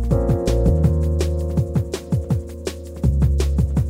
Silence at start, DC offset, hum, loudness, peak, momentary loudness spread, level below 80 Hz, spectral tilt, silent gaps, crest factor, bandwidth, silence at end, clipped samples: 0 s; under 0.1%; none; -21 LUFS; -4 dBFS; 7 LU; -22 dBFS; -7.5 dB/octave; none; 14 dB; 15.5 kHz; 0 s; under 0.1%